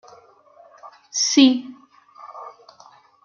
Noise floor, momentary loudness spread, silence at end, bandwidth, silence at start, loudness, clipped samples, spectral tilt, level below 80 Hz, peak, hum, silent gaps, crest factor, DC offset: -51 dBFS; 27 LU; 0.75 s; 7.2 kHz; 0.85 s; -17 LUFS; under 0.1%; -1 dB/octave; -78 dBFS; -2 dBFS; none; none; 22 dB; under 0.1%